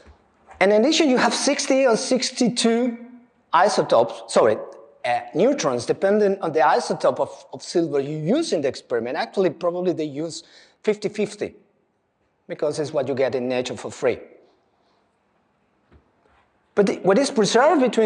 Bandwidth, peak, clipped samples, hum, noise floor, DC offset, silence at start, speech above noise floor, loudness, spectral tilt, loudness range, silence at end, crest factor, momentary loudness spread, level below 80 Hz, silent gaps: 11 kHz; -2 dBFS; under 0.1%; none; -68 dBFS; under 0.1%; 0.5 s; 48 dB; -21 LUFS; -4 dB/octave; 8 LU; 0 s; 20 dB; 11 LU; -68 dBFS; none